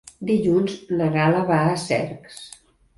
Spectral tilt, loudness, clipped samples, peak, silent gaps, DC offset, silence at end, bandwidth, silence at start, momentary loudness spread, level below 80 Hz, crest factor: -6.5 dB/octave; -21 LUFS; under 0.1%; -6 dBFS; none; under 0.1%; 0.5 s; 11.5 kHz; 0.2 s; 19 LU; -54 dBFS; 16 dB